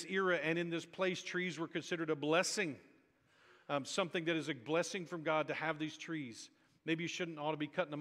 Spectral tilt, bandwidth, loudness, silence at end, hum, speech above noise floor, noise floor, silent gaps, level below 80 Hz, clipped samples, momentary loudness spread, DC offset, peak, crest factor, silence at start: -4 dB/octave; 15 kHz; -38 LUFS; 0 s; none; 32 dB; -71 dBFS; none; -86 dBFS; under 0.1%; 10 LU; under 0.1%; -18 dBFS; 22 dB; 0 s